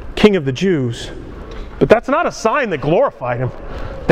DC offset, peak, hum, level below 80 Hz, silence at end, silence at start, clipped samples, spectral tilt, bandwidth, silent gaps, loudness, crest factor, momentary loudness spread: under 0.1%; 0 dBFS; none; -34 dBFS; 0 s; 0 s; 0.1%; -6 dB/octave; 12 kHz; none; -16 LUFS; 16 dB; 18 LU